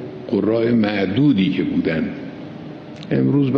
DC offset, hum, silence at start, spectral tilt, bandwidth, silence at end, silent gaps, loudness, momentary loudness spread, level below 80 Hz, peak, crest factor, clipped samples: under 0.1%; none; 0 s; -9 dB/octave; 6 kHz; 0 s; none; -19 LUFS; 18 LU; -54 dBFS; -4 dBFS; 16 dB; under 0.1%